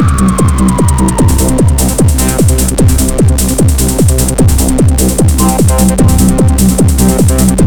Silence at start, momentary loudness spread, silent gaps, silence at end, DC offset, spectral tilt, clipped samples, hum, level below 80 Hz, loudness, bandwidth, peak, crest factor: 0 s; 1 LU; none; 0 s; under 0.1%; -5.5 dB/octave; under 0.1%; none; -12 dBFS; -9 LUFS; 20 kHz; 0 dBFS; 8 dB